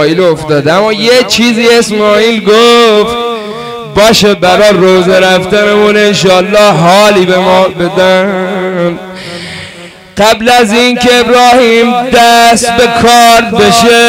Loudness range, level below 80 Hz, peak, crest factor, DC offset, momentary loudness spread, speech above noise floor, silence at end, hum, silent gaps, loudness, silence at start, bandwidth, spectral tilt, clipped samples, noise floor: 5 LU; -36 dBFS; 0 dBFS; 6 dB; under 0.1%; 11 LU; 24 dB; 0 s; none; none; -5 LUFS; 0 s; 16.5 kHz; -4 dB/octave; under 0.1%; -29 dBFS